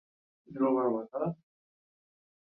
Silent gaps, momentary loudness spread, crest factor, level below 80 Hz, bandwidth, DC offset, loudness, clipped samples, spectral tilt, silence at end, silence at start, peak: none; 19 LU; 18 dB; -78 dBFS; 3 kHz; under 0.1%; -31 LUFS; under 0.1%; -12 dB/octave; 1.2 s; 0.5 s; -16 dBFS